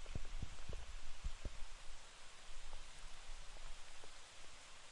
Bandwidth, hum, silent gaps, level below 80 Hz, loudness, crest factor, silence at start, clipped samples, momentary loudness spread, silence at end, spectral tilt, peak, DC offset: 11 kHz; none; none; -50 dBFS; -55 LUFS; 14 dB; 0 s; under 0.1%; 6 LU; 0 s; -3 dB/octave; -30 dBFS; under 0.1%